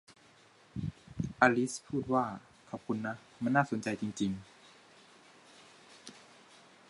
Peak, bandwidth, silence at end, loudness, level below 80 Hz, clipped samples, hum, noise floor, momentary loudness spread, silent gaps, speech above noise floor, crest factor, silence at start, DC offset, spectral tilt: -10 dBFS; 11.5 kHz; 0.7 s; -33 LUFS; -62 dBFS; under 0.1%; none; -62 dBFS; 23 LU; none; 30 dB; 26 dB; 0.1 s; under 0.1%; -5.5 dB/octave